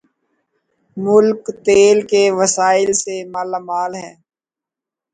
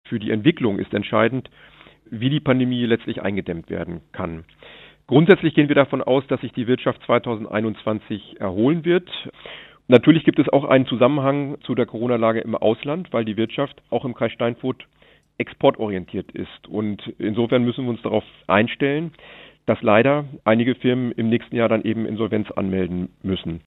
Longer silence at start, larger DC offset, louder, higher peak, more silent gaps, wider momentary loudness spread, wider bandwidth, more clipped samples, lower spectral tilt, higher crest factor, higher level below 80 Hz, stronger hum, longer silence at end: first, 0.95 s vs 0.1 s; neither; first, -15 LUFS vs -21 LUFS; about the same, 0 dBFS vs 0 dBFS; neither; about the same, 13 LU vs 13 LU; first, 9.4 kHz vs 4.1 kHz; neither; second, -3.5 dB/octave vs -9.5 dB/octave; about the same, 16 dB vs 20 dB; about the same, -58 dBFS vs -58 dBFS; neither; first, 1.05 s vs 0.05 s